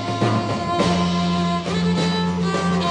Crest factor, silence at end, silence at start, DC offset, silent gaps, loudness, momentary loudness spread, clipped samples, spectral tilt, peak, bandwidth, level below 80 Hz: 14 dB; 0 s; 0 s; under 0.1%; none; -20 LUFS; 2 LU; under 0.1%; -6 dB/octave; -6 dBFS; 10 kHz; -50 dBFS